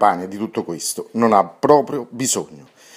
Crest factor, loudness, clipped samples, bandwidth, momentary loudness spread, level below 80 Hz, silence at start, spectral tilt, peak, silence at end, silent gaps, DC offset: 18 dB; -19 LUFS; under 0.1%; 16 kHz; 10 LU; -64 dBFS; 0 s; -4 dB/octave; 0 dBFS; 0.4 s; none; under 0.1%